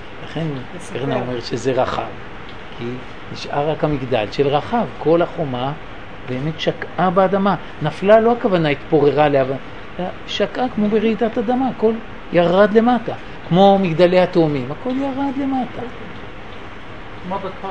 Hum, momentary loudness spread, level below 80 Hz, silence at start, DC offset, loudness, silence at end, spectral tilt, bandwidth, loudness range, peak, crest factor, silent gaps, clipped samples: none; 19 LU; -44 dBFS; 0 s; 2%; -18 LUFS; 0 s; -7 dB/octave; 10 kHz; 7 LU; 0 dBFS; 18 dB; none; under 0.1%